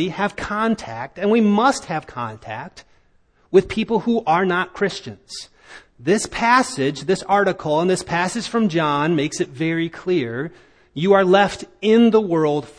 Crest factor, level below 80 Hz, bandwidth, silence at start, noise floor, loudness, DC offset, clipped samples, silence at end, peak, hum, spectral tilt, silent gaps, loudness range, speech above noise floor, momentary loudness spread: 18 dB; -52 dBFS; 10.5 kHz; 0 s; -58 dBFS; -19 LUFS; under 0.1%; under 0.1%; 0.05 s; 0 dBFS; none; -5.5 dB/octave; none; 3 LU; 39 dB; 16 LU